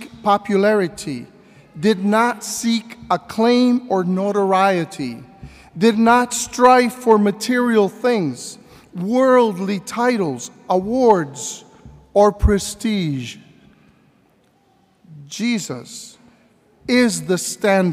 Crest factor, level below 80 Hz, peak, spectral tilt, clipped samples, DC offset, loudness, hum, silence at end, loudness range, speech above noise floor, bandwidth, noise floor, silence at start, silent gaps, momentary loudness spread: 18 dB; -38 dBFS; 0 dBFS; -5 dB/octave; under 0.1%; under 0.1%; -18 LUFS; none; 0 s; 9 LU; 41 dB; 16 kHz; -58 dBFS; 0 s; none; 15 LU